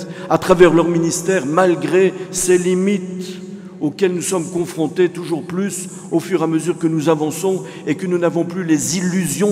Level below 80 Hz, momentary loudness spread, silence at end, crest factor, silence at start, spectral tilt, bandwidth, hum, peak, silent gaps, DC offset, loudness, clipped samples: -50 dBFS; 9 LU; 0 s; 16 dB; 0 s; -5 dB/octave; 16 kHz; none; 0 dBFS; none; under 0.1%; -17 LUFS; under 0.1%